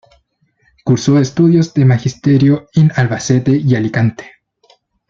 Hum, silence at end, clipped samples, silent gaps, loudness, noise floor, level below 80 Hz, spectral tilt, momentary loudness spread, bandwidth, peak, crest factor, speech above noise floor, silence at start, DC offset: none; 0.85 s; under 0.1%; none; -13 LUFS; -59 dBFS; -50 dBFS; -7 dB/octave; 5 LU; 7.6 kHz; -2 dBFS; 12 dB; 48 dB; 0.85 s; under 0.1%